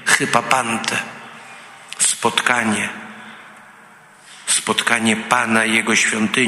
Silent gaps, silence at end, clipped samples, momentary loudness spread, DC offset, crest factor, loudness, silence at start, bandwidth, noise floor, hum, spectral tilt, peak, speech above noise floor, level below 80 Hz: none; 0 s; under 0.1%; 21 LU; under 0.1%; 20 dB; -17 LUFS; 0 s; 15.5 kHz; -45 dBFS; none; -2 dB/octave; 0 dBFS; 28 dB; -62 dBFS